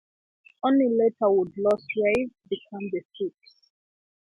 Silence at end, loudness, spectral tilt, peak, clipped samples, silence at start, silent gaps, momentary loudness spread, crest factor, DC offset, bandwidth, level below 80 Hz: 0.95 s; -25 LUFS; -7 dB/octave; -10 dBFS; under 0.1%; 0.65 s; 3.05-3.09 s; 13 LU; 16 dB; under 0.1%; 10.5 kHz; -64 dBFS